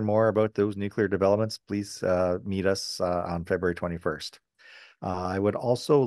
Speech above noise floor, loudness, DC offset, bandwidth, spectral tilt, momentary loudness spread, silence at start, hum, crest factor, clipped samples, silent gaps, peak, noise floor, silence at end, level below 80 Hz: 26 dB; -27 LUFS; under 0.1%; 12.5 kHz; -6 dB/octave; 9 LU; 0 s; none; 18 dB; under 0.1%; none; -8 dBFS; -53 dBFS; 0 s; -58 dBFS